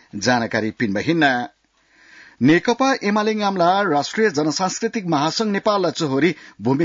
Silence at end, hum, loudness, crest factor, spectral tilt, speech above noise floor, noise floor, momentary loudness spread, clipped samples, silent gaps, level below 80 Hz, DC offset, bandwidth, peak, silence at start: 0 s; none; -19 LUFS; 14 dB; -5 dB/octave; 38 dB; -57 dBFS; 6 LU; under 0.1%; none; -62 dBFS; under 0.1%; 7.6 kHz; -6 dBFS; 0.15 s